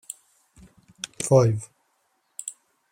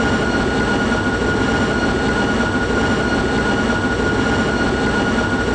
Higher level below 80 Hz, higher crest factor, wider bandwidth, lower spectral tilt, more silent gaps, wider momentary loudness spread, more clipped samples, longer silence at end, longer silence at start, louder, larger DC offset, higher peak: second, -60 dBFS vs -30 dBFS; first, 22 dB vs 10 dB; first, 16 kHz vs 9.8 kHz; about the same, -6 dB/octave vs -5.5 dB/octave; neither; first, 22 LU vs 1 LU; neither; first, 0.4 s vs 0 s; first, 1.2 s vs 0 s; second, -23 LUFS vs -17 LUFS; neither; about the same, -4 dBFS vs -6 dBFS